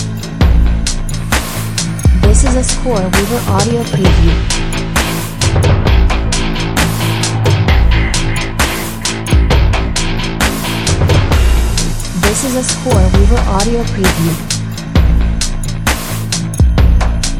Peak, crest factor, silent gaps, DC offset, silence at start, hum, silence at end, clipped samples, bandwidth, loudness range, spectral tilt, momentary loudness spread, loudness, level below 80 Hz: 0 dBFS; 12 dB; none; under 0.1%; 0 s; none; 0 s; under 0.1%; 16 kHz; 2 LU; -4.5 dB/octave; 6 LU; -13 LUFS; -14 dBFS